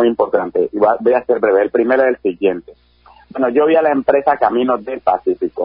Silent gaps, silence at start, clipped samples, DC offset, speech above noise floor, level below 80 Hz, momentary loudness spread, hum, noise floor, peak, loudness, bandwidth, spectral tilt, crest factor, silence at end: none; 0 s; under 0.1%; under 0.1%; 29 dB; -54 dBFS; 6 LU; none; -44 dBFS; 0 dBFS; -15 LUFS; 5.2 kHz; -11 dB/octave; 14 dB; 0 s